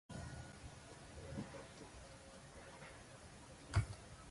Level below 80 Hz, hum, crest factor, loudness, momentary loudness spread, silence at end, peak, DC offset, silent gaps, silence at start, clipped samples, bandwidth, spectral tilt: -56 dBFS; none; 24 dB; -50 LUFS; 16 LU; 0 s; -24 dBFS; under 0.1%; none; 0.1 s; under 0.1%; 11.5 kHz; -5.5 dB/octave